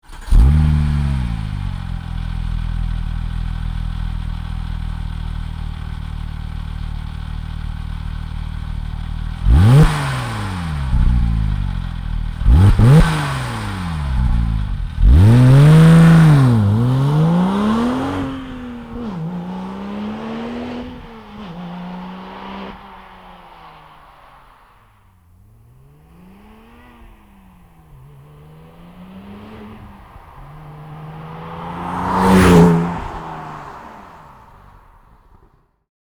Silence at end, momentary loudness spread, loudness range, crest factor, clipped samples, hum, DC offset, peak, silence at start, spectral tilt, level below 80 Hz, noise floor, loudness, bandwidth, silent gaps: 1.85 s; 23 LU; 22 LU; 14 dB; under 0.1%; none; under 0.1%; -2 dBFS; 0.1 s; -7.5 dB/octave; -24 dBFS; -54 dBFS; -16 LUFS; 15 kHz; none